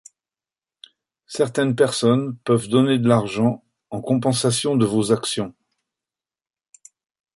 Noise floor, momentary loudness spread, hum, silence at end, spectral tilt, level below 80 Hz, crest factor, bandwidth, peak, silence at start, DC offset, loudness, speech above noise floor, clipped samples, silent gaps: under -90 dBFS; 13 LU; none; 1.9 s; -5.5 dB/octave; -60 dBFS; 20 dB; 11.5 kHz; -2 dBFS; 1.3 s; under 0.1%; -20 LUFS; over 71 dB; under 0.1%; none